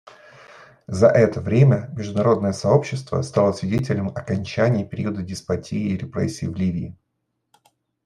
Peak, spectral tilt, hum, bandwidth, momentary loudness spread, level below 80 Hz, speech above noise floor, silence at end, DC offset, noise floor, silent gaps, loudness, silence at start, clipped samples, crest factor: -2 dBFS; -7.5 dB/octave; none; 11 kHz; 10 LU; -56 dBFS; 55 dB; 1.15 s; under 0.1%; -75 dBFS; none; -21 LUFS; 0.5 s; under 0.1%; 20 dB